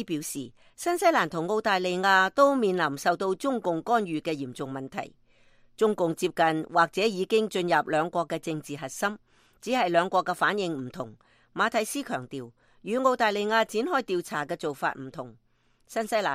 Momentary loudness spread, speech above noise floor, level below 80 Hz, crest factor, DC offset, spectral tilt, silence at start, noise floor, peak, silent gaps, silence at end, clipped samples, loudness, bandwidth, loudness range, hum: 15 LU; 32 dB; -68 dBFS; 20 dB; under 0.1%; -4 dB/octave; 0 s; -59 dBFS; -8 dBFS; none; 0 s; under 0.1%; -27 LUFS; 15.5 kHz; 4 LU; none